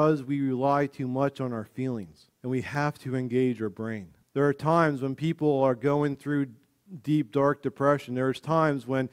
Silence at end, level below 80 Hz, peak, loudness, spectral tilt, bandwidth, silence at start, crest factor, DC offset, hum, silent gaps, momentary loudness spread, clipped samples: 0.05 s; -64 dBFS; -8 dBFS; -27 LUFS; -8 dB/octave; 13.5 kHz; 0 s; 18 dB; under 0.1%; none; none; 10 LU; under 0.1%